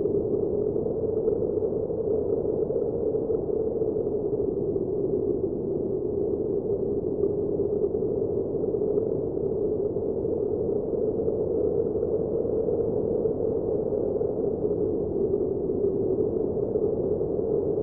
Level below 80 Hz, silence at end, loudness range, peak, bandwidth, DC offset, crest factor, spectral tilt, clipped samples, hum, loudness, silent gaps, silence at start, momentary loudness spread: -48 dBFS; 0 s; 1 LU; -12 dBFS; 1.6 kHz; 0.1%; 14 dB; -15 dB/octave; under 0.1%; none; -27 LUFS; none; 0 s; 2 LU